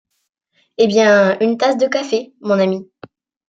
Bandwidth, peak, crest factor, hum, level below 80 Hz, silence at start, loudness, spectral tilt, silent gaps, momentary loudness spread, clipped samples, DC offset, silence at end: 7.8 kHz; -2 dBFS; 16 dB; none; -66 dBFS; 0.8 s; -15 LUFS; -5 dB/octave; none; 10 LU; under 0.1%; under 0.1%; 0.7 s